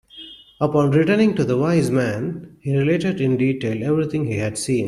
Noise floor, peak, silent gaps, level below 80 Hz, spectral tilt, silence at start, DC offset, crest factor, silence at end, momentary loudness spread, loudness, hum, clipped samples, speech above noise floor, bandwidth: -42 dBFS; -4 dBFS; none; -54 dBFS; -6.5 dB/octave; 0.15 s; under 0.1%; 14 dB; 0 s; 11 LU; -20 LUFS; none; under 0.1%; 23 dB; 13 kHz